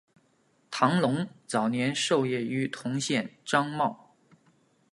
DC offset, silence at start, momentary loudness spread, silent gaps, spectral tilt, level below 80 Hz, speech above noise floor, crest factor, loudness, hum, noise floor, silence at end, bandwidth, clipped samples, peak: under 0.1%; 0.7 s; 6 LU; none; -4.5 dB/octave; -74 dBFS; 40 dB; 22 dB; -28 LUFS; none; -67 dBFS; 0.95 s; 11.5 kHz; under 0.1%; -8 dBFS